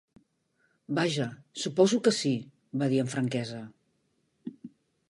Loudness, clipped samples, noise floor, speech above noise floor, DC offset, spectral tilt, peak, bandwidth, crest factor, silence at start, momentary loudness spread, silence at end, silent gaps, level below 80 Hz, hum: -29 LUFS; under 0.1%; -74 dBFS; 46 dB; under 0.1%; -5 dB/octave; -10 dBFS; 11.5 kHz; 20 dB; 0.9 s; 20 LU; 0.4 s; none; -74 dBFS; none